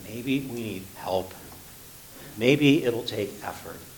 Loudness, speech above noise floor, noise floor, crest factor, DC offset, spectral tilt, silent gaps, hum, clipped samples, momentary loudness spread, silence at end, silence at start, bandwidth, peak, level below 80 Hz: -26 LUFS; 20 dB; -46 dBFS; 22 dB; under 0.1%; -5.5 dB/octave; none; none; under 0.1%; 23 LU; 0 s; 0 s; 19 kHz; -6 dBFS; -58 dBFS